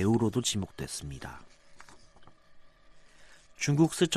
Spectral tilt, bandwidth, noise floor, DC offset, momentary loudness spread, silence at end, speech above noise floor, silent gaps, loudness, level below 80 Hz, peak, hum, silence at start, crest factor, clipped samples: -5 dB/octave; 14 kHz; -55 dBFS; under 0.1%; 18 LU; 0 s; 26 dB; none; -30 LUFS; -56 dBFS; -12 dBFS; none; 0 s; 20 dB; under 0.1%